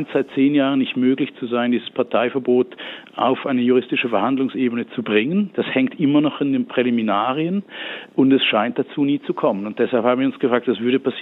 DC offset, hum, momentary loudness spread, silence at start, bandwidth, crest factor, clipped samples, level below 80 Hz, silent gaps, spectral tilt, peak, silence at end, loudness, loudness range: under 0.1%; none; 6 LU; 0 s; 4.1 kHz; 16 dB; under 0.1%; -76 dBFS; none; -8.5 dB/octave; -4 dBFS; 0 s; -19 LUFS; 1 LU